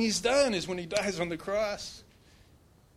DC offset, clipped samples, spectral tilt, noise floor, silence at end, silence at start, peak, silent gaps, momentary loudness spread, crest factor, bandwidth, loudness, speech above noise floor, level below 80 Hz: under 0.1%; under 0.1%; -3.5 dB/octave; -60 dBFS; 0.95 s; 0 s; -10 dBFS; none; 14 LU; 22 dB; 14.5 kHz; -30 LUFS; 30 dB; -58 dBFS